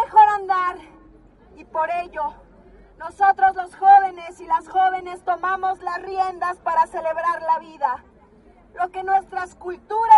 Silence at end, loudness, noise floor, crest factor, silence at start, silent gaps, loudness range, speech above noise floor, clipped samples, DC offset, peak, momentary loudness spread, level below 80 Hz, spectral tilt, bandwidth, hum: 0 s; -21 LUFS; -51 dBFS; 20 dB; 0 s; none; 5 LU; 31 dB; under 0.1%; under 0.1%; -2 dBFS; 15 LU; -54 dBFS; -4 dB/octave; 11 kHz; none